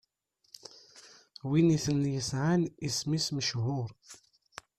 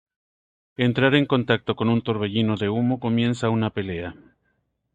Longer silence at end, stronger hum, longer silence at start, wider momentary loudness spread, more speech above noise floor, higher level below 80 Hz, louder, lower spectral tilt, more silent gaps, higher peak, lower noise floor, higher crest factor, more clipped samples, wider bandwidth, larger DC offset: second, 0.65 s vs 0.8 s; neither; first, 0.95 s vs 0.8 s; first, 24 LU vs 11 LU; second, 44 dB vs 49 dB; about the same, -62 dBFS vs -58 dBFS; second, -30 LUFS vs -22 LUFS; second, -5 dB/octave vs -7 dB/octave; neither; second, -14 dBFS vs -6 dBFS; about the same, -74 dBFS vs -71 dBFS; about the same, 18 dB vs 18 dB; neither; first, 14 kHz vs 9 kHz; neither